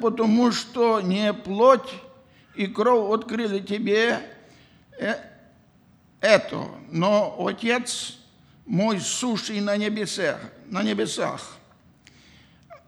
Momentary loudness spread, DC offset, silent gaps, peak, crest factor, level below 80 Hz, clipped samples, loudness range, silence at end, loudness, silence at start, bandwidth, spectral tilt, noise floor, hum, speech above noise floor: 13 LU; under 0.1%; none; -2 dBFS; 22 dB; -66 dBFS; under 0.1%; 5 LU; 0.1 s; -23 LUFS; 0 s; 13 kHz; -4.5 dB/octave; -57 dBFS; none; 34 dB